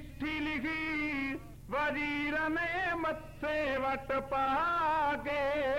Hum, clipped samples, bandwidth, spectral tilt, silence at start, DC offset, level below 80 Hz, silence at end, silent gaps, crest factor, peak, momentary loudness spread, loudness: none; under 0.1%; 16.5 kHz; -5.5 dB/octave; 0 s; 0.2%; -54 dBFS; 0 s; none; 10 dB; -22 dBFS; 7 LU; -33 LUFS